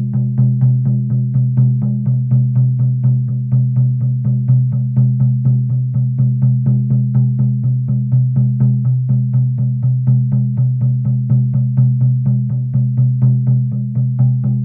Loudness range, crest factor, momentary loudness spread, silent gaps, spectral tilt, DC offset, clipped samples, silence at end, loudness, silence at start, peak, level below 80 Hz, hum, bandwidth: 0 LU; 10 dB; 3 LU; none; -15 dB/octave; under 0.1%; under 0.1%; 0 s; -15 LUFS; 0 s; -2 dBFS; -54 dBFS; none; 1.3 kHz